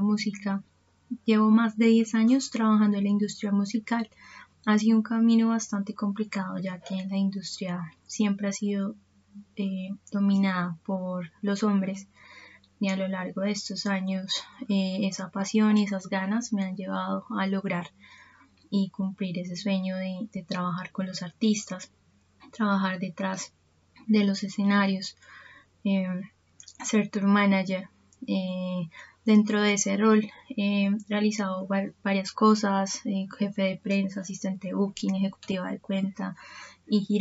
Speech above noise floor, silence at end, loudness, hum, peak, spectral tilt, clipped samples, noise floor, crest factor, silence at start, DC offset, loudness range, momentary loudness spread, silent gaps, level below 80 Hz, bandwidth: 32 dB; 0 s; -27 LUFS; none; -10 dBFS; -5.5 dB/octave; under 0.1%; -58 dBFS; 16 dB; 0 s; under 0.1%; 6 LU; 12 LU; none; -74 dBFS; 8 kHz